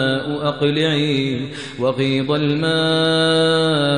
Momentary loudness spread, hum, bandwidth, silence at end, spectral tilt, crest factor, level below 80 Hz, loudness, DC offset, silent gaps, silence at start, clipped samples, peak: 7 LU; none; 10.5 kHz; 0 s; -5.5 dB/octave; 14 dB; -54 dBFS; -18 LUFS; 0.3%; none; 0 s; under 0.1%; -4 dBFS